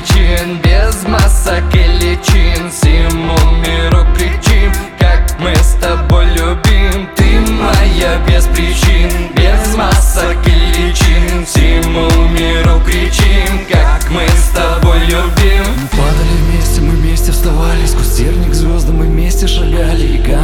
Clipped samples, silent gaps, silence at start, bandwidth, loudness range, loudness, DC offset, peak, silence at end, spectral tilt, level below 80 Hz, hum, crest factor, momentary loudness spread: under 0.1%; none; 0 s; 17 kHz; 2 LU; -11 LUFS; under 0.1%; 0 dBFS; 0 s; -5 dB/octave; -10 dBFS; none; 8 dB; 3 LU